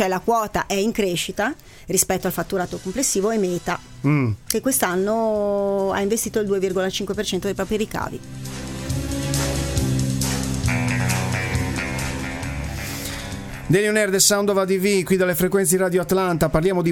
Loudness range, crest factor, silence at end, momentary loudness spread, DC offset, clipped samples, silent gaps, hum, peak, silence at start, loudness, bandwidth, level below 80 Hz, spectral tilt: 6 LU; 20 dB; 0 s; 10 LU; under 0.1%; under 0.1%; none; none; 0 dBFS; 0 s; -21 LUFS; 17.5 kHz; -38 dBFS; -4.5 dB/octave